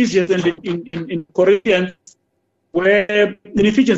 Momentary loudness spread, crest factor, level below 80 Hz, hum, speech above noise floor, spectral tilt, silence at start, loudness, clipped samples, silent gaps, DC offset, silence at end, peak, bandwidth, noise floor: 11 LU; 14 dB; -50 dBFS; none; 52 dB; -5.5 dB/octave; 0 s; -17 LUFS; under 0.1%; none; under 0.1%; 0 s; -2 dBFS; 8 kHz; -68 dBFS